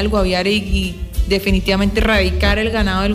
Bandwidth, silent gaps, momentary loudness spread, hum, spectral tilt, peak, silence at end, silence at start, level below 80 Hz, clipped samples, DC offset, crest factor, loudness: 15.5 kHz; none; 6 LU; none; -5.5 dB/octave; -4 dBFS; 0 s; 0 s; -22 dBFS; under 0.1%; under 0.1%; 12 dB; -17 LUFS